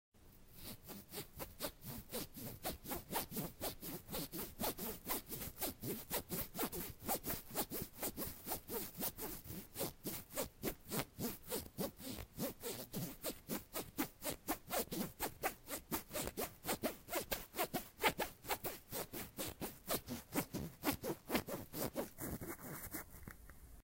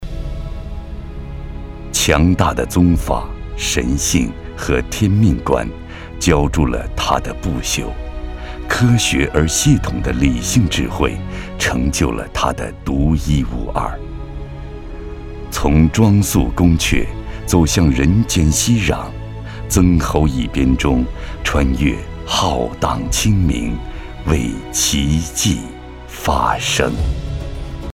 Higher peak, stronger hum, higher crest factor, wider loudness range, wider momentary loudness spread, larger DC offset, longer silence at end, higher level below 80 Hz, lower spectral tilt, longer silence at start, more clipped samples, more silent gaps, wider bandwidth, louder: second, -18 dBFS vs 0 dBFS; neither; first, 28 dB vs 16 dB; about the same, 3 LU vs 4 LU; second, 7 LU vs 17 LU; neither; about the same, 0 s vs 0.05 s; second, -60 dBFS vs -24 dBFS; second, -3.5 dB/octave vs -5 dB/octave; first, 0.15 s vs 0 s; neither; neither; about the same, 16 kHz vs 17.5 kHz; second, -44 LUFS vs -16 LUFS